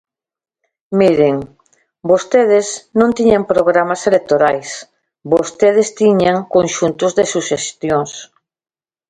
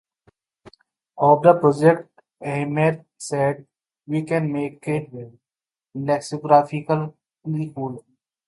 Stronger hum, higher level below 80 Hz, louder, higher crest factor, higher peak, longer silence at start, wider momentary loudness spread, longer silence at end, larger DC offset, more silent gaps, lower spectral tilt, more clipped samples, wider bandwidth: neither; first, -52 dBFS vs -66 dBFS; first, -14 LUFS vs -21 LUFS; second, 14 dB vs 22 dB; about the same, 0 dBFS vs 0 dBFS; first, 0.9 s vs 0.65 s; second, 10 LU vs 18 LU; first, 0.85 s vs 0.45 s; neither; neither; second, -5 dB/octave vs -7 dB/octave; neither; second, 9.6 kHz vs 11.5 kHz